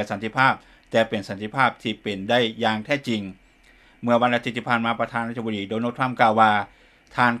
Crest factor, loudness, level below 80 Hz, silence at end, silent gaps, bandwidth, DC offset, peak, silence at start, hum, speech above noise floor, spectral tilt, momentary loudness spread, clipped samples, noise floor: 22 dB; -23 LUFS; -60 dBFS; 0 s; none; 13 kHz; under 0.1%; 0 dBFS; 0 s; none; 32 dB; -5.5 dB/octave; 10 LU; under 0.1%; -54 dBFS